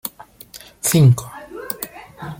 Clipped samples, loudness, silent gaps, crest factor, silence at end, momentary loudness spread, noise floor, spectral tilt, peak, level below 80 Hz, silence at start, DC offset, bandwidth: under 0.1%; -17 LUFS; none; 18 dB; 0.05 s; 25 LU; -42 dBFS; -5.5 dB/octave; -2 dBFS; -50 dBFS; 0.05 s; under 0.1%; 17 kHz